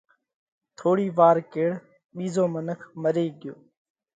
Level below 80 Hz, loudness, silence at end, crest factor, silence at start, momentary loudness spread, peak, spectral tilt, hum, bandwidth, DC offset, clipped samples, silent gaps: -72 dBFS; -24 LUFS; 0.6 s; 20 dB; 0.8 s; 19 LU; -6 dBFS; -7.5 dB/octave; none; 9.2 kHz; under 0.1%; under 0.1%; 2.04-2.09 s